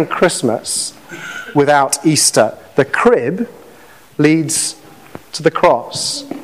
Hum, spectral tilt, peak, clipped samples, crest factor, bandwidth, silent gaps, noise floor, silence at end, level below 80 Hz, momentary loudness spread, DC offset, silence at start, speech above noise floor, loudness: none; -3.5 dB/octave; 0 dBFS; under 0.1%; 16 dB; 16 kHz; none; -42 dBFS; 0 s; -52 dBFS; 15 LU; 0.3%; 0 s; 28 dB; -14 LUFS